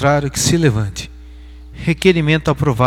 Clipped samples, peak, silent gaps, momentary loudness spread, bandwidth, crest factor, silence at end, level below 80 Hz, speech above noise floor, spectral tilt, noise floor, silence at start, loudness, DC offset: under 0.1%; 0 dBFS; none; 11 LU; 16 kHz; 16 dB; 0 s; -34 dBFS; 21 dB; -5 dB/octave; -35 dBFS; 0 s; -16 LUFS; under 0.1%